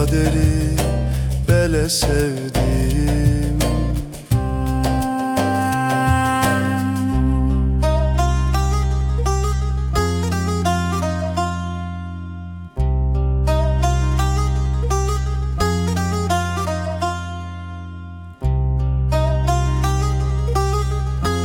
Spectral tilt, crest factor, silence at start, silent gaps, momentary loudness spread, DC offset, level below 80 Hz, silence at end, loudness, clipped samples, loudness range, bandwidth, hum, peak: -6 dB/octave; 14 dB; 0 s; none; 8 LU; under 0.1%; -22 dBFS; 0 s; -20 LUFS; under 0.1%; 4 LU; 18 kHz; none; -4 dBFS